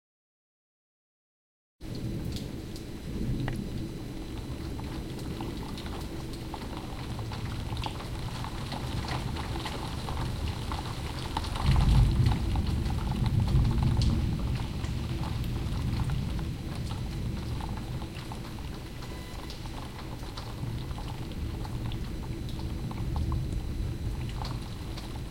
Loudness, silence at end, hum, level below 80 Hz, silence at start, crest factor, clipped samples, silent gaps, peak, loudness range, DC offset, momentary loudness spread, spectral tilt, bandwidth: -33 LUFS; 0 s; none; -36 dBFS; 1.8 s; 20 dB; under 0.1%; none; -12 dBFS; 10 LU; under 0.1%; 12 LU; -6.5 dB/octave; 16.5 kHz